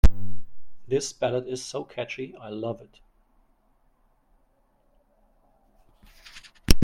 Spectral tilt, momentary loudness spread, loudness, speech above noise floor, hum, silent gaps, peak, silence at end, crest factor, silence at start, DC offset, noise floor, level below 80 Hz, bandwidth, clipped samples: -5 dB/octave; 21 LU; -31 LUFS; 34 dB; none; none; 0 dBFS; 0 s; 24 dB; 0.05 s; under 0.1%; -65 dBFS; -32 dBFS; 16.5 kHz; under 0.1%